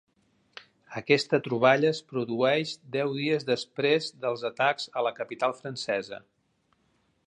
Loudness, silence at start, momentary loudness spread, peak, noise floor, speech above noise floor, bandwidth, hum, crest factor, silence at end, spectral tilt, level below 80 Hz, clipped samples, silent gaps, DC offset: -27 LUFS; 0.9 s; 9 LU; -6 dBFS; -71 dBFS; 44 dB; 10.5 kHz; none; 22 dB; 1.1 s; -5 dB/octave; -76 dBFS; under 0.1%; none; under 0.1%